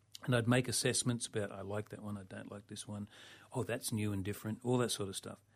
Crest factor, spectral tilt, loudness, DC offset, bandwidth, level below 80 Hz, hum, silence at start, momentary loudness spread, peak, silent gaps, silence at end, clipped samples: 20 dB; -4.5 dB/octave; -37 LUFS; under 0.1%; 15.5 kHz; -70 dBFS; none; 0.2 s; 15 LU; -16 dBFS; none; 0.2 s; under 0.1%